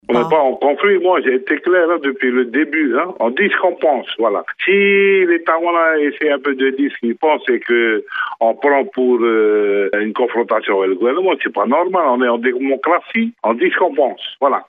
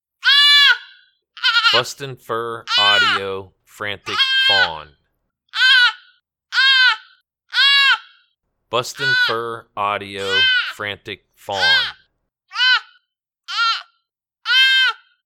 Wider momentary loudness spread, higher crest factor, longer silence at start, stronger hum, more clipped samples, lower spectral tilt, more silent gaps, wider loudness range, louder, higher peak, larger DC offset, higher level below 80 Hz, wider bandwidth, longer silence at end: second, 4 LU vs 17 LU; about the same, 14 dB vs 18 dB; second, 0.1 s vs 0.25 s; neither; neither; first, -7.5 dB/octave vs -1 dB/octave; neither; second, 2 LU vs 5 LU; about the same, -15 LUFS vs -15 LUFS; about the same, -2 dBFS vs 0 dBFS; neither; second, -68 dBFS vs -62 dBFS; second, 4 kHz vs 17.5 kHz; second, 0.05 s vs 0.35 s